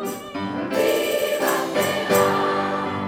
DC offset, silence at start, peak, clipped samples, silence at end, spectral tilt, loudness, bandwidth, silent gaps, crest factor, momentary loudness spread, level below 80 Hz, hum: under 0.1%; 0 s; -6 dBFS; under 0.1%; 0 s; -4 dB/octave; -21 LUFS; 20 kHz; none; 16 dB; 9 LU; -62 dBFS; none